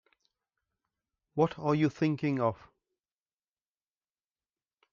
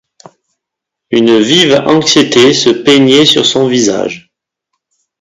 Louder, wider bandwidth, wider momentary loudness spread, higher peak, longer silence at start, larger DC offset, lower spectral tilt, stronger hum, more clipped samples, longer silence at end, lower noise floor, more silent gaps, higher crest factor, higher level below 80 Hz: second, -30 LUFS vs -7 LUFS; second, 7.2 kHz vs 13.5 kHz; about the same, 8 LU vs 9 LU; second, -12 dBFS vs 0 dBFS; first, 1.35 s vs 1.1 s; neither; first, -8 dB/octave vs -3.5 dB/octave; neither; second, under 0.1% vs 0.6%; first, 2.4 s vs 1 s; first, under -90 dBFS vs -78 dBFS; neither; first, 22 dB vs 10 dB; second, -72 dBFS vs -50 dBFS